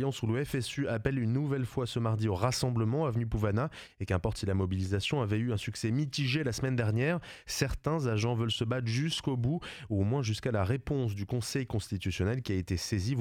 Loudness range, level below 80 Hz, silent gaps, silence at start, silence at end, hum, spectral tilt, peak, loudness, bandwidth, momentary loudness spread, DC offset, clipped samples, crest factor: 1 LU; -50 dBFS; none; 0 s; 0 s; none; -6 dB/octave; -14 dBFS; -32 LUFS; 16 kHz; 4 LU; under 0.1%; under 0.1%; 18 dB